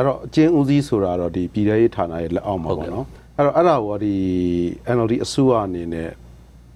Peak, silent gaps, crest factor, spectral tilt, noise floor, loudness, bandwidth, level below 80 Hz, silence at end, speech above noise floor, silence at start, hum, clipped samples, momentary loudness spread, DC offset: -2 dBFS; none; 18 dB; -7.5 dB/octave; -44 dBFS; -20 LUFS; 12 kHz; -44 dBFS; 0.45 s; 25 dB; 0 s; none; under 0.1%; 10 LU; under 0.1%